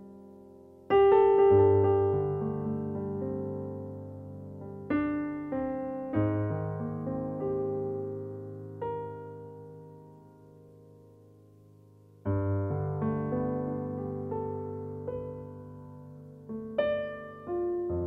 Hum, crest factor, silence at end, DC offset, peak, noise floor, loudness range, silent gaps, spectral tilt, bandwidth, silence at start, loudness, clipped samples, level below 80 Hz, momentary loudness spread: none; 18 dB; 0 s; under 0.1%; -12 dBFS; -56 dBFS; 15 LU; none; -10.5 dB/octave; 3.9 kHz; 0 s; -30 LUFS; under 0.1%; -58 dBFS; 23 LU